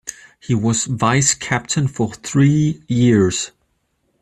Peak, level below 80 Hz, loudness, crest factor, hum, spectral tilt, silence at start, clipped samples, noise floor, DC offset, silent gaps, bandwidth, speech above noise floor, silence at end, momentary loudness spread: -2 dBFS; -50 dBFS; -17 LUFS; 16 dB; none; -5 dB/octave; 0.05 s; under 0.1%; -67 dBFS; under 0.1%; none; 13 kHz; 50 dB; 0.75 s; 10 LU